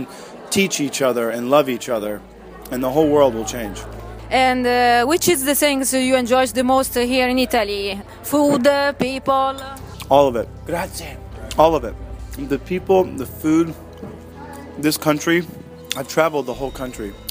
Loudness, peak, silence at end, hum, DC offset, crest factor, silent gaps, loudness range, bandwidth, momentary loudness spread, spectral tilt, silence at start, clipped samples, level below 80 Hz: -18 LUFS; 0 dBFS; 0 s; none; under 0.1%; 18 dB; none; 5 LU; 16 kHz; 18 LU; -4 dB/octave; 0 s; under 0.1%; -40 dBFS